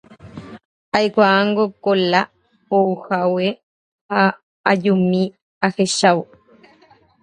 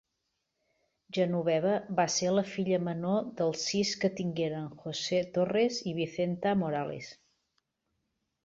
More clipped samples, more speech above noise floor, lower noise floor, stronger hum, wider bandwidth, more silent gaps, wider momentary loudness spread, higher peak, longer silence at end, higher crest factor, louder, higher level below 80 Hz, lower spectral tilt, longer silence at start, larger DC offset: neither; second, 36 dB vs 52 dB; second, -53 dBFS vs -82 dBFS; neither; first, 11 kHz vs 8 kHz; first, 0.65-0.92 s, 3.63-4.09 s, 4.43-4.64 s, 5.42-5.61 s vs none; first, 12 LU vs 7 LU; first, 0 dBFS vs -14 dBFS; second, 1 s vs 1.3 s; about the same, 18 dB vs 18 dB; first, -18 LUFS vs -31 LUFS; first, -62 dBFS vs -70 dBFS; about the same, -5 dB/octave vs -5 dB/octave; second, 0.25 s vs 1.1 s; neither